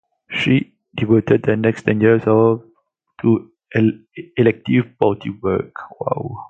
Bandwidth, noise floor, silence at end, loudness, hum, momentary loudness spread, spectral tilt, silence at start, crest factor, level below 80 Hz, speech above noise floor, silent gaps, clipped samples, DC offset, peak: 8 kHz; -61 dBFS; 0.05 s; -18 LUFS; none; 11 LU; -8.5 dB/octave; 0.3 s; 18 dB; -50 dBFS; 45 dB; none; under 0.1%; under 0.1%; 0 dBFS